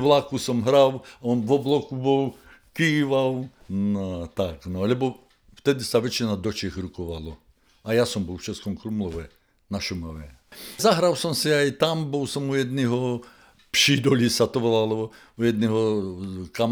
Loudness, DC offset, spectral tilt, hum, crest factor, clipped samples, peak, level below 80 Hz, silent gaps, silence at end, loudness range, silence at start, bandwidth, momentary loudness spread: -24 LUFS; under 0.1%; -5 dB/octave; none; 20 dB; under 0.1%; -4 dBFS; -52 dBFS; none; 0 s; 7 LU; 0 s; over 20 kHz; 14 LU